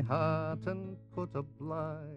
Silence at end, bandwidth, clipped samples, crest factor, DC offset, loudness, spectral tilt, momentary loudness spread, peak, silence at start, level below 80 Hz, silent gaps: 0 s; 6.2 kHz; under 0.1%; 18 dB; under 0.1%; -37 LUFS; -9.5 dB/octave; 10 LU; -18 dBFS; 0 s; -64 dBFS; none